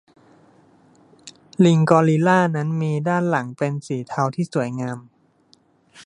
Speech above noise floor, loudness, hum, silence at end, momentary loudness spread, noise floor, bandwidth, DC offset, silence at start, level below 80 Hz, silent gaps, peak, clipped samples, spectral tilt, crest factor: 39 dB; -20 LUFS; none; 0.05 s; 13 LU; -58 dBFS; 11 kHz; under 0.1%; 1.25 s; -66 dBFS; none; -2 dBFS; under 0.1%; -7.5 dB/octave; 20 dB